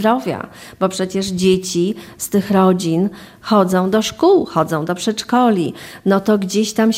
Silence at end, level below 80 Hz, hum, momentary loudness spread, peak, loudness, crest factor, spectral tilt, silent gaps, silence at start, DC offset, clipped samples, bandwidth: 0 s; -52 dBFS; none; 9 LU; -2 dBFS; -17 LUFS; 14 dB; -5.5 dB/octave; none; 0 s; under 0.1%; under 0.1%; 16 kHz